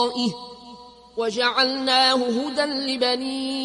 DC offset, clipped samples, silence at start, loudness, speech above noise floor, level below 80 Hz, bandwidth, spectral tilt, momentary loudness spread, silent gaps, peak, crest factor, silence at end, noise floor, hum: under 0.1%; under 0.1%; 0 s; -21 LUFS; 22 dB; -64 dBFS; 11.5 kHz; -3 dB/octave; 18 LU; none; -8 dBFS; 16 dB; 0 s; -44 dBFS; none